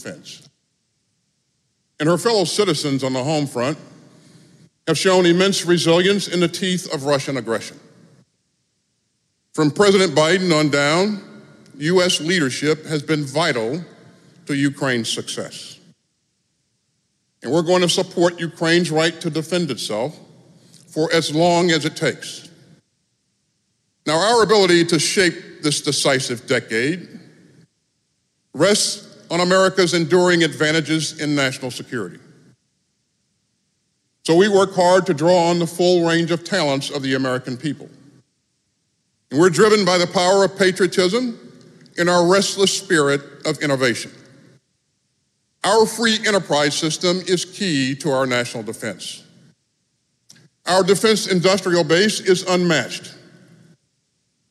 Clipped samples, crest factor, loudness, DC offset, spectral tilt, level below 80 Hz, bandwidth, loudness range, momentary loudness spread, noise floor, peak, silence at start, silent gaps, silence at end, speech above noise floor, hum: under 0.1%; 18 dB; -18 LUFS; under 0.1%; -4 dB/octave; -66 dBFS; 14 kHz; 6 LU; 14 LU; -69 dBFS; -2 dBFS; 0 s; none; 1.35 s; 52 dB; none